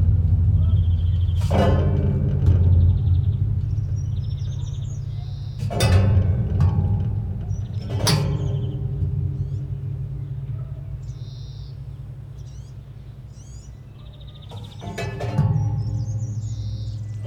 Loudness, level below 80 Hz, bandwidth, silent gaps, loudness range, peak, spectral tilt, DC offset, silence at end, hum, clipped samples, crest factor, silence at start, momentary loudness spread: -23 LUFS; -32 dBFS; 16.5 kHz; none; 16 LU; -4 dBFS; -7 dB/octave; under 0.1%; 0 s; none; under 0.1%; 18 dB; 0 s; 19 LU